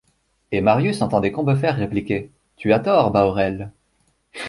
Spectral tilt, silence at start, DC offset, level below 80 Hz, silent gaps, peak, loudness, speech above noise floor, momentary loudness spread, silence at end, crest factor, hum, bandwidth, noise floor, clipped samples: -7.5 dB/octave; 0.5 s; under 0.1%; -48 dBFS; none; -2 dBFS; -20 LUFS; 46 dB; 11 LU; 0 s; 18 dB; none; 11.5 kHz; -65 dBFS; under 0.1%